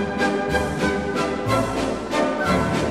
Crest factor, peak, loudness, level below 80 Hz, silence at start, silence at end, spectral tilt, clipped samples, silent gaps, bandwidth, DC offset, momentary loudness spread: 16 dB; -6 dBFS; -22 LUFS; -38 dBFS; 0 s; 0 s; -5.5 dB/octave; under 0.1%; none; 15 kHz; 0.3%; 3 LU